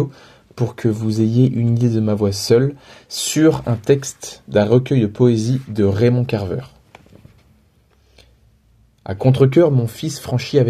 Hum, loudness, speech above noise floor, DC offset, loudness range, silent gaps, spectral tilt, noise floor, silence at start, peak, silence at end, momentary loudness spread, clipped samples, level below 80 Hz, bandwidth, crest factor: none; -17 LUFS; 39 dB; under 0.1%; 6 LU; none; -6.5 dB/octave; -55 dBFS; 0 s; 0 dBFS; 0 s; 11 LU; under 0.1%; -50 dBFS; 14.5 kHz; 18 dB